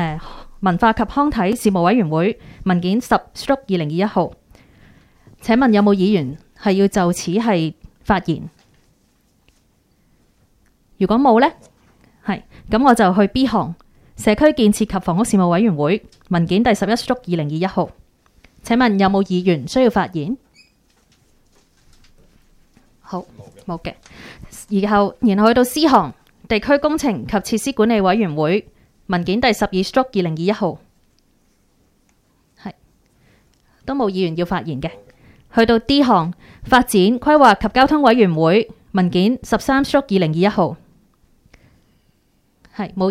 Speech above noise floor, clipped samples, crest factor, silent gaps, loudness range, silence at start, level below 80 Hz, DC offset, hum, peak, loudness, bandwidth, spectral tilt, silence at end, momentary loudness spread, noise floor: 44 dB; under 0.1%; 18 dB; none; 11 LU; 0 s; -42 dBFS; under 0.1%; none; 0 dBFS; -17 LUFS; 15.5 kHz; -6 dB/octave; 0 s; 15 LU; -60 dBFS